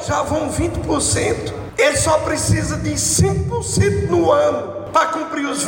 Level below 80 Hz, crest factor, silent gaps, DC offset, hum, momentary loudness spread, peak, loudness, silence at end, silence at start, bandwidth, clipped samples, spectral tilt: -34 dBFS; 14 dB; none; under 0.1%; none; 6 LU; -4 dBFS; -18 LUFS; 0 s; 0 s; 17 kHz; under 0.1%; -4.5 dB/octave